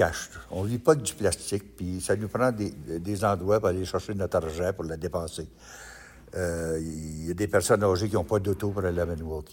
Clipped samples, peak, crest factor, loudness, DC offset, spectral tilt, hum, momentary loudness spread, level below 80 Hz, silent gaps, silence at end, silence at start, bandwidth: under 0.1%; -8 dBFS; 20 dB; -28 LUFS; under 0.1%; -5.5 dB/octave; none; 13 LU; -48 dBFS; none; 0 s; 0 s; 17 kHz